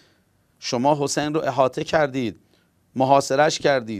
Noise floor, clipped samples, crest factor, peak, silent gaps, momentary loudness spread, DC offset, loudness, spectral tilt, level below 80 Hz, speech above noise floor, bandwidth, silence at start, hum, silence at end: -62 dBFS; under 0.1%; 20 dB; -2 dBFS; none; 10 LU; under 0.1%; -21 LUFS; -4.5 dB/octave; -60 dBFS; 42 dB; 15 kHz; 0.6 s; none; 0 s